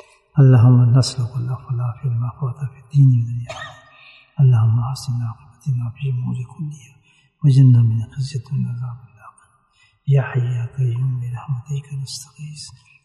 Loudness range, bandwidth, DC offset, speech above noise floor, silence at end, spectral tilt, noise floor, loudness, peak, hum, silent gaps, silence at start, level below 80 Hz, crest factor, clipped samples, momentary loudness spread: 6 LU; 11 kHz; under 0.1%; 41 dB; 0.35 s; -7.5 dB/octave; -59 dBFS; -18 LUFS; -2 dBFS; none; none; 0.35 s; -56 dBFS; 16 dB; under 0.1%; 19 LU